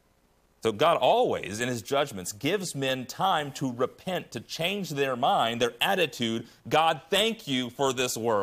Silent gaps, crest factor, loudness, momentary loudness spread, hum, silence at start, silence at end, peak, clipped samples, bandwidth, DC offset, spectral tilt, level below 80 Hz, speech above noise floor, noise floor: none; 18 dB; -27 LUFS; 8 LU; none; 0.65 s; 0 s; -10 dBFS; under 0.1%; 15.5 kHz; under 0.1%; -3.5 dB/octave; -66 dBFS; 38 dB; -65 dBFS